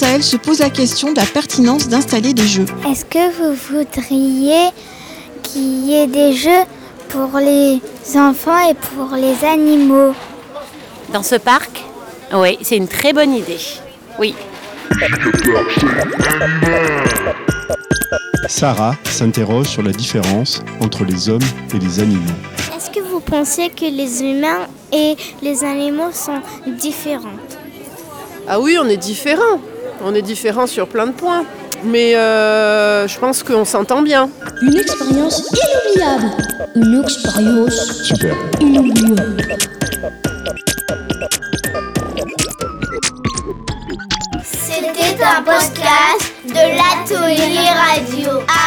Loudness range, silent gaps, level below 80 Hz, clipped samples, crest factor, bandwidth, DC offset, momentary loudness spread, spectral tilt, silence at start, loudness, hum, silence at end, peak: 6 LU; none; -40 dBFS; under 0.1%; 14 dB; over 20 kHz; under 0.1%; 11 LU; -4 dB/octave; 0 s; -14 LUFS; none; 0 s; -2 dBFS